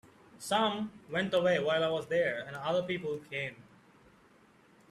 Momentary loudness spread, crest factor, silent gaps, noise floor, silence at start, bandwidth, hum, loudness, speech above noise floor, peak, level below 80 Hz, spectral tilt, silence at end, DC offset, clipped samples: 10 LU; 16 dB; none; -62 dBFS; 0.35 s; 13.5 kHz; none; -32 LUFS; 30 dB; -18 dBFS; -72 dBFS; -4.5 dB/octave; 1.3 s; under 0.1%; under 0.1%